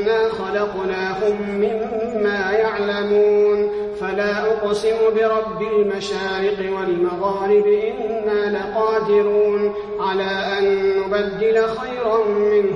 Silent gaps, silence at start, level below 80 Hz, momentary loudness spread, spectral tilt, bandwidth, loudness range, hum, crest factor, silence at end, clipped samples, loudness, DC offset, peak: none; 0 s; -50 dBFS; 6 LU; -5.5 dB/octave; 9.4 kHz; 1 LU; none; 12 dB; 0 s; under 0.1%; -19 LUFS; under 0.1%; -6 dBFS